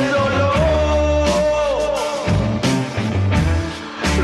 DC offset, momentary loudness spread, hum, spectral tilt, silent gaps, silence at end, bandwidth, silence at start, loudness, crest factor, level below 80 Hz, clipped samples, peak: under 0.1%; 5 LU; none; -6 dB/octave; none; 0 s; 13 kHz; 0 s; -18 LUFS; 12 dB; -26 dBFS; under 0.1%; -6 dBFS